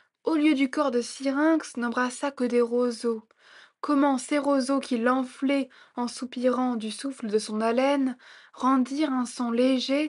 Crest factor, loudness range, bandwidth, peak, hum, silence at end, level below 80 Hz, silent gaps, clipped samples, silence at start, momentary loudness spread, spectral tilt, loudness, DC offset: 16 dB; 2 LU; 11.5 kHz; -10 dBFS; none; 0 s; -80 dBFS; none; under 0.1%; 0.25 s; 8 LU; -4 dB/octave; -26 LUFS; under 0.1%